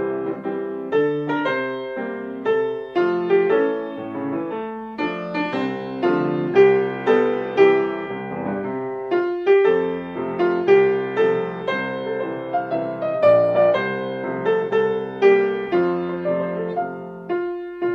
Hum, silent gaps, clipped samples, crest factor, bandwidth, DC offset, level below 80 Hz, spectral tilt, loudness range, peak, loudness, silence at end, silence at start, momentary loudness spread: none; none; under 0.1%; 16 dB; 6.2 kHz; under 0.1%; -62 dBFS; -8 dB/octave; 3 LU; -4 dBFS; -21 LUFS; 0 s; 0 s; 11 LU